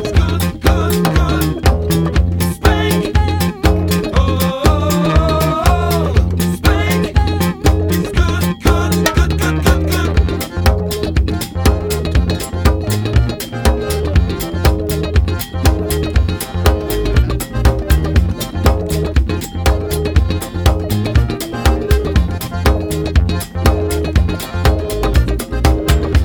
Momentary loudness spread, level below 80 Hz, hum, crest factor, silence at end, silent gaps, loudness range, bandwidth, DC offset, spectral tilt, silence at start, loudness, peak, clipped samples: 4 LU; -18 dBFS; none; 14 dB; 0 s; none; 2 LU; 19.5 kHz; under 0.1%; -6 dB/octave; 0 s; -15 LUFS; 0 dBFS; under 0.1%